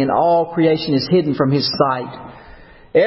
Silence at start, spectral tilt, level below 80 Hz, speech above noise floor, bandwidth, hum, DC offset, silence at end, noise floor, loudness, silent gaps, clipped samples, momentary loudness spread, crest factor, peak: 0 s; -10 dB/octave; -50 dBFS; 25 dB; 5.8 kHz; none; under 0.1%; 0 s; -41 dBFS; -17 LUFS; none; under 0.1%; 8 LU; 16 dB; -2 dBFS